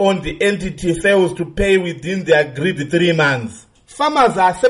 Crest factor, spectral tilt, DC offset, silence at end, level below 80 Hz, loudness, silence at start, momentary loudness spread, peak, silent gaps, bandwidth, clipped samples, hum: 14 dB; -5.5 dB/octave; under 0.1%; 0 s; -36 dBFS; -16 LUFS; 0 s; 7 LU; -2 dBFS; none; 11.5 kHz; under 0.1%; none